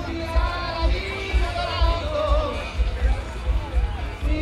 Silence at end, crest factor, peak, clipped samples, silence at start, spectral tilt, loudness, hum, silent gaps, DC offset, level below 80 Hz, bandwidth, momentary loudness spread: 0 s; 14 dB; -8 dBFS; under 0.1%; 0 s; -6 dB/octave; -25 LUFS; none; none; under 0.1%; -24 dBFS; 10.5 kHz; 5 LU